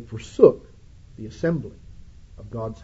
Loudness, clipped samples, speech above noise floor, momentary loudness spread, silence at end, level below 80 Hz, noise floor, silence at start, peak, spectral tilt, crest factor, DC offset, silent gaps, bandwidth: -21 LUFS; under 0.1%; 25 dB; 23 LU; 0.1 s; -48 dBFS; -47 dBFS; 0 s; 0 dBFS; -8 dB/octave; 24 dB; under 0.1%; none; 8 kHz